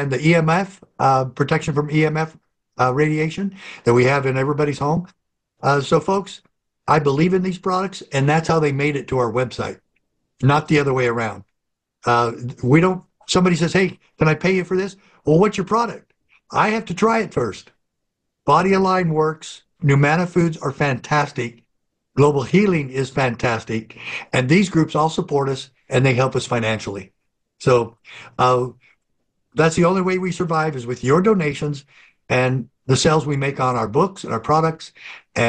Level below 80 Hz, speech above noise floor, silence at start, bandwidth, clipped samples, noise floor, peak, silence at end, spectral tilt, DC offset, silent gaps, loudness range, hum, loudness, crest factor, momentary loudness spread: -50 dBFS; 60 dB; 0 s; 10 kHz; under 0.1%; -78 dBFS; -4 dBFS; 0 s; -6 dB/octave; under 0.1%; none; 2 LU; none; -19 LUFS; 16 dB; 12 LU